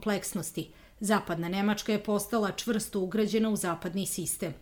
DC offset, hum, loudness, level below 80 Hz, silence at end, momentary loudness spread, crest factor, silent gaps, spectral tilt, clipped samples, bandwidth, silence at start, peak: under 0.1%; none; -30 LUFS; -58 dBFS; 0 s; 7 LU; 18 dB; none; -4.5 dB/octave; under 0.1%; over 20 kHz; 0 s; -12 dBFS